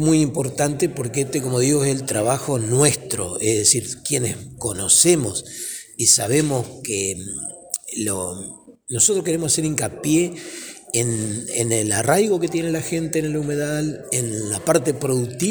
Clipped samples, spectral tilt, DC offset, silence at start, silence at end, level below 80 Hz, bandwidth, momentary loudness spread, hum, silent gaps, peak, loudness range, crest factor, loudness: under 0.1%; -4 dB/octave; under 0.1%; 0 s; 0 s; -52 dBFS; over 20 kHz; 12 LU; none; none; 0 dBFS; 4 LU; 20 dB; -20 LUFS